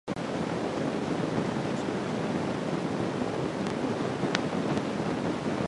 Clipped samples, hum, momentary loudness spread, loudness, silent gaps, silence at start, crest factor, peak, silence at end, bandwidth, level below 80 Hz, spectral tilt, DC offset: under 0.1%; none; 2 LU; -30 LUFS; none; 0.05 s; 26 dB; -4 dBFS; 0 s; 11.5 kHz; -56 dBFS; -6 dB/octave; under 0.1%